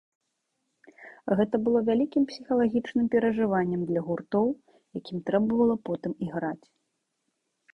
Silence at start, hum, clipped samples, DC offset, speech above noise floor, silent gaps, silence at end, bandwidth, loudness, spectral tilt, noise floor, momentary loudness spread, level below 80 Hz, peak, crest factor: 1 s; none; under 0.1%; under 0.1%; 53 dB; none; 1.15 s; 6.2 kHz; -27 LUFS; -8.5 dB/octave; -79 dBFS; 11 LU; -62 dBFS; -10 dBFS; 18 dB